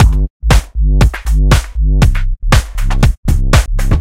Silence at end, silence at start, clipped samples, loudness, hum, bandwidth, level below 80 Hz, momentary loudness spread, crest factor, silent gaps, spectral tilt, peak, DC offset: 0 s; 0 s; under 0.1%; -14 LUFS; none; 15.5 kHz; -12 dBFS; 4 LU; 10 dB; 0.30-0.40 s, 3.17-3.23 s; -5.5 dB/octave; 0 dBFS; under 0.1%